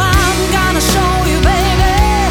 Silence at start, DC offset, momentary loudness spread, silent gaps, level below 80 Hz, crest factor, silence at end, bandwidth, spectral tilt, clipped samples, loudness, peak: 0 s; under 0.1%; 1 LU; none; -16 dBFS; 10 dB; 0 s; 18 kHz; -4 dB/octave; under 0.1%; -12 LUFS; -2 dBFS